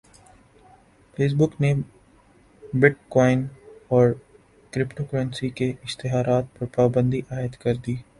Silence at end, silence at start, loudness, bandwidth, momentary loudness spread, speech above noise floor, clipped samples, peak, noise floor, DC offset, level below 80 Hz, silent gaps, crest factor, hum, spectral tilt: 0.15 s; 1.2 s; -23 LUFS; 11.5 kHz; 11 LU; 33 dB; under 0.1%; 0 dBFS; -55 dBFS; under 0.1%; -52 dBFS; none; 24 dB; none; -7.5 dB/octave